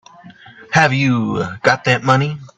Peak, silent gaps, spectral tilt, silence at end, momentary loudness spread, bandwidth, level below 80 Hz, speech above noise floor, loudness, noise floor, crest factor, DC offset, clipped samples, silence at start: 0 dBFS; none; -5.5 dB/octave; 0.1 s; 4 LU; 8.4 kHz; -52 dBFS; 25 dB; -15 LUFS; -41 dBFS; 16 dB; under 0.1%; under 0.1%; 0.25 s